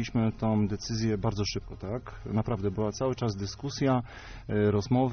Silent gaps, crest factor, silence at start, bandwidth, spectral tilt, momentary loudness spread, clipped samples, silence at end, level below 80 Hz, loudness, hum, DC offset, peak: none; 16 dB; 0 s; 6.6 kHz; -6.5 dB/octave; 10 LU; under 0.1%; 0 s; -48 dBFS; -30 LUFS; none; under 0.1%; -14 dBFS